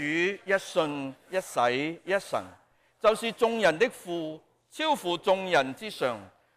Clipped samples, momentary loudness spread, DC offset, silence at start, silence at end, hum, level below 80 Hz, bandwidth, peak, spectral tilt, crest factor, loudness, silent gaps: under 0.1%; 11 LU; under 0.1%; 0 s; 0.3 s; none; -68 dBFS; 15.5 kHz; -12 dBFS; -4 dB/octave; 16 dB; -28 LUFS; none